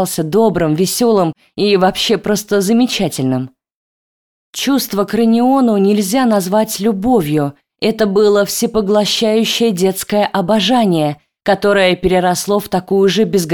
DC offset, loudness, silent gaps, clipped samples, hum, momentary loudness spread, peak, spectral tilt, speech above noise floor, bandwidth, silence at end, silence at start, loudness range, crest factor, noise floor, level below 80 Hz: 0.2%; -14 LUFS; 3.74-4.53 s; under 0.1%; none; 6 LU; -2 dBFS; -4.5 dB/octave; over 77 dB; over 20 kHz; 0 s; 0 s; 2 LU; 12 dB; under -90 dBFS; -44 dBFS